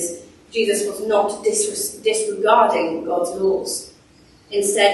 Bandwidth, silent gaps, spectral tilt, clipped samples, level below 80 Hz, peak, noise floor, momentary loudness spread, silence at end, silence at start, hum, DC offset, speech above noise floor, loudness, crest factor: 12.5 kHz; none; -2 dB/octave; under 0.1%; -60 dBFS; -2 dBFS; -51 dBFS; 11 LU; 0 s; 0 s; none; under 0.1%; 32 dB; -20 LUFS; 18 dB